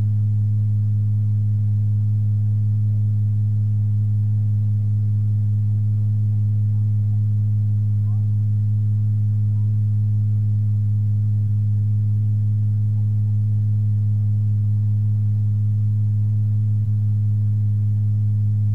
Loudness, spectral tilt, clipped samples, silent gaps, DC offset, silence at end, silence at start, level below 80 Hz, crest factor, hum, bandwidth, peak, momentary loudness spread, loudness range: -20 LUFS; -11.5 dB/octave; under 0.1%; none; 2%; 0 s; 0 s; -48 dBFS; 4 dB; 50 Hz at -45 dBFS; 0.7 kHz; -12 dBFS; 0 LU; 0 LU